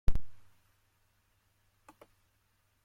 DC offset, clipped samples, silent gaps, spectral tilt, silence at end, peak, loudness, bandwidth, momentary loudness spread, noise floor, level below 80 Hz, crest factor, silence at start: under 0.1%; under 0.1%; none; -7 dB/octave; 2.5 s; -14 dBFS; -43 LUFS; 4.9 kHz; 23 LU; -74 dBFS; -42 dBFS; 20 dB; 0.1 s